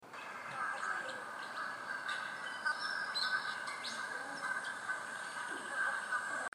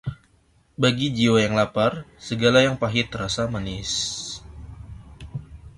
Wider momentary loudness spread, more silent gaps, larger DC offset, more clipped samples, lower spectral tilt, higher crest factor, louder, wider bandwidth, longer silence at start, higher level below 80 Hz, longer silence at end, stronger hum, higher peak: second, 7 LU vs 23 LU; neither; neither; neither; second, -0.5 dB/octave vs -4.5 dB/octave; about the same, 18 dB vs 20 dB; second, -39 LUFS vs -22 LUFS; first, 15.5 kHz vs 11.5 kHz; about the same, 0 s vs 0.05 s; second, under -90 dBFS vs -46 dBFS; about the same, 0.05 s vs 0.05 s; neither; second, -22 dBFS vs -4 dBFS